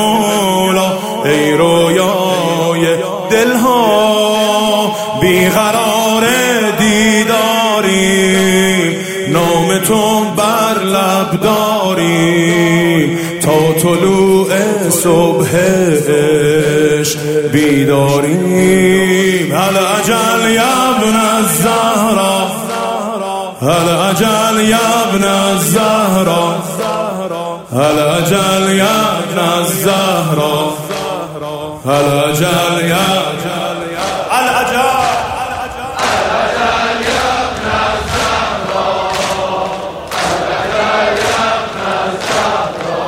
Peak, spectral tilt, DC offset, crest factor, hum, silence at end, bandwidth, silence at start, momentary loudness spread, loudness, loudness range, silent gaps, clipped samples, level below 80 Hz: 0 dBFS; -4 dB/octave; under 0.1%; 12 dB; none; 0 s; 16.5 kHz; 0 s; 7 LU; -12 LUFS; 4 LU; none; under 0.1%; -42 dBFS